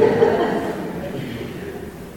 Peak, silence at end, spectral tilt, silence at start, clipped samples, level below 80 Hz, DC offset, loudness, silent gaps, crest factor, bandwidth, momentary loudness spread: -2 dBFS; 0 s; -6.5 dB/octave; 0 s; under 0.1%; -46 dBFS; 0.2%; -22 LUFS; none; 18 dB; 17 kHz; 15 LU